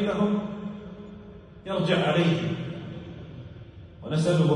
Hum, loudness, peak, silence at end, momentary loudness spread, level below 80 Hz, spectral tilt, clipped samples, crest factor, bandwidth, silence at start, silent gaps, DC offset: none; -26 LUFS; -10 dBFS; 0 s; 21 LU; -56 dBFS; -7 dB/octave; under 0.1%; 16 dB; 11 kHz; 0 s; none; under 0.1%